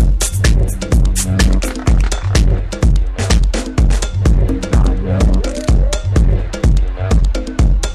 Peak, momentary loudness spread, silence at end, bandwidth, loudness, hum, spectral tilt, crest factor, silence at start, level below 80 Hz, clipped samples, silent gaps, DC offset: 0 dBFS; 2 LU; 0 s; 13.5 kHz; -15 LUFS; none; -5.5 dB/octave; 12 dB; 0 s; -14 dBFS; under 0.1%; none; under 0.1%